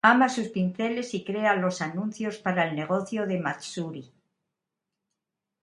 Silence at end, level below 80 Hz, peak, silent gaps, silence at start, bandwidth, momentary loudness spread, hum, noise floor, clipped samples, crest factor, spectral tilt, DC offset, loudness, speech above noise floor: 1.6 s; -72 dBFS; -4 dBFS; none; 0.05 s; 11 kHz; 9 LU; none; -86 dBFS; under 0.1%; 24 dB; -5.5 dB/octave; under 0.1%; -27 LUFS; 59 dB